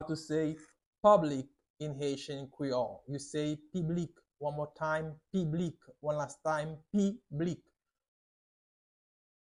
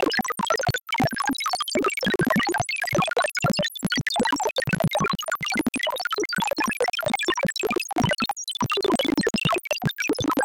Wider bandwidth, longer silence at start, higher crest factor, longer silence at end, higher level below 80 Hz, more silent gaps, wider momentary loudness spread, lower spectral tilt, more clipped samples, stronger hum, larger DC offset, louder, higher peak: second, 11.5 kHz vs 17 kHz; about the same, 0 s vs 0 s; first, 22 dB vs 14 dB; first, 1.85 s vs 0 s; second, -68 dBFS vs -52 dBFS; first, 0.86-0.93 s, 1.70-1.74 s vs none; first, 13 LU vs 3 LU; first, -6.5 dB/octave vs -4 dB/octave; neither; neither; neither; second, -35 LUFS vs -24 LUFS; about the same, -12 dBFS vs -10 dBFS